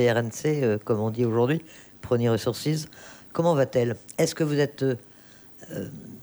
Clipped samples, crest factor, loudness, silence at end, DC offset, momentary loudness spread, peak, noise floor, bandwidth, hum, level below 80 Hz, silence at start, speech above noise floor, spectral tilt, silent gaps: under 0.1%; 16 dB; -26 LUFS; 0 s; under 0.1%; 15 LU; -10 dBFS; -50 dBFS; over 20 kHz; none; -62 dBFS; 0 s; 25 dB; -6 dB/octave; none